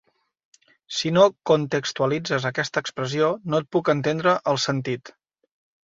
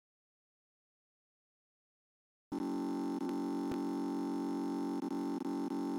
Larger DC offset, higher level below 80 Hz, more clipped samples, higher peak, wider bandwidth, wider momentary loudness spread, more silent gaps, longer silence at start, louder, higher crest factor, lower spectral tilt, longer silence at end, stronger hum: neither; first, -64 dBFS vs -76 dBFS; neither; first, -4 dBFS vs -26 dBFS; second, 8 kHz vs 16 kHz; first, 9 LU vs 1 LU; neither; second, 0.9 s vs 2.5 s; first, -23 LUFS vs -38 LUFS; first, 20 dB vs 14 dB; second, -5 dB/octave vs -7 dB/octave; first, 0.8 s vs 0 s; neither